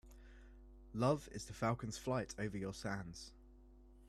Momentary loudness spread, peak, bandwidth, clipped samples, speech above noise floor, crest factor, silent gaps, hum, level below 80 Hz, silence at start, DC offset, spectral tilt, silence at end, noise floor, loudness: 24 LU; -22 dBFS; 14 kHz; under 0.1%; 21 dB; 20 dB; none; none; -60 dBFS; 0.05 s; under 0.1%; -5.5 dB/octave; 0 s; -62 dBFS; -42 LUFS